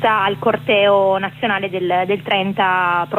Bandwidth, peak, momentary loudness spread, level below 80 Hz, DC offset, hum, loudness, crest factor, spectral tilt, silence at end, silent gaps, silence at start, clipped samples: 15.5 kHz; -4 dBFS; 6 LU; -56 dBFS; under 0.1%; none; -17 LUFS; 12 dB; -6.5 dB/octave; 0 s; none; 0 s; under 0.1%